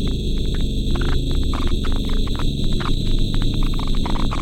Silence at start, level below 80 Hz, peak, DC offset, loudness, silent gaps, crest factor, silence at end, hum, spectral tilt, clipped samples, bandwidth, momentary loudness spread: 0 s; -20 dBFS; -6 dBFS; under 0.1%; -23 LUFS; none; 12 dB; 0 s; none; -6 dB/octave; under 0.1%; 12 kHz; 1 LU